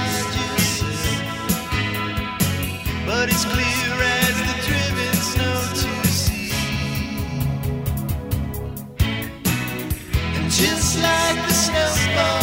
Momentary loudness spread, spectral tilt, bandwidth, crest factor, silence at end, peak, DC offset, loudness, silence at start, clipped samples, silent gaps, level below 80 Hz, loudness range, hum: 8 LU; -3.5 dB/octave; 16.5 kHz; 18 dB; 0 s; -4 dBFS; under 0.1%; -21 LUFS; 0 s; under 0.1%; none; -32 dBFS; 5 LU; none